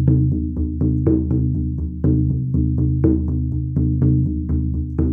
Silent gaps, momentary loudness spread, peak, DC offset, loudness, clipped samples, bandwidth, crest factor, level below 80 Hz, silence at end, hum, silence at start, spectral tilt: none; 5 LU; -4 dBFS; under 0.1%; -20 LUFS; under 0.1%; 1.8 kHz; 14 dB; -24 dBFS; 0 s; none; 0 s; -14.5 dB/octave